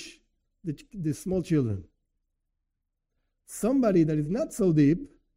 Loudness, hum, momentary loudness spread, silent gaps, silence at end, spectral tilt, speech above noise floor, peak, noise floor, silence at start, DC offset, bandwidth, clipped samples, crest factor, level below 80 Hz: -26 LUFS; none; 15 LU; none; 0.3 s; -7.5 dB/octave; 56 dB; -12 dBFS; -82 dBFS; 0 s; under 0.1%; 16 kHz; under 0.1%; 16 dB; -54 dBFS